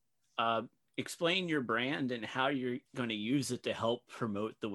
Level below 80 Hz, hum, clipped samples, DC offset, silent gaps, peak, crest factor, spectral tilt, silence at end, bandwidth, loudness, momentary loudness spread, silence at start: -78 dBFS; none; under 0.1%; under 0.1%; none; -16 dBFS; 18 dB; -4.5 dB/octave; 0 s; 13 kHz; -35 LUFS; 7 LU; 0.35 s